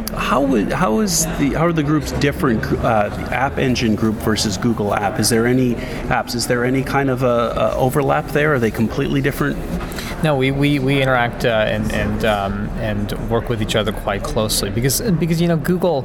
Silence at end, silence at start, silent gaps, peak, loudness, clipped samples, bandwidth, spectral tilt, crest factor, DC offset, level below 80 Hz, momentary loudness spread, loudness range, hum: 0 s; 0 s; none; -2 dBFS; -18 LUFS; under 0.1%; over 20 kHz; -5 dB/octave; 16 dB; under 0.1%; -32 dBFS; 5 LU; 2 LU; none